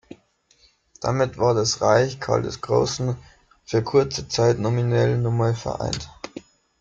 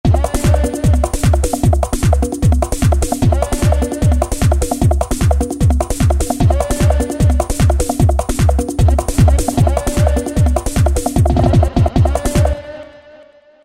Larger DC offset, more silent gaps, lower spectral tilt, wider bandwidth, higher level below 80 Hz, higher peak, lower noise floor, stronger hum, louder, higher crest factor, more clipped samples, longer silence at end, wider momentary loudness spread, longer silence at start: neither; neither; about the same, -5.5 dB/octave vs -6.5 dB/octave; second, 7.8 kHz vs 16 kHz; second, -50 dBFS vs -18 dBFS; second, -4 dBFS vs 0 dBFS; first, -60 dBFS vs -43 dBFS; neither; second, -22 LUFS vs -15 LUFS; first, 18 dB vs 12 dB; neither; about the same, 0.4 s vs 0.5 s; first, 11 LU vs 3 LU; about the same, 0.1 s vs 0.05 s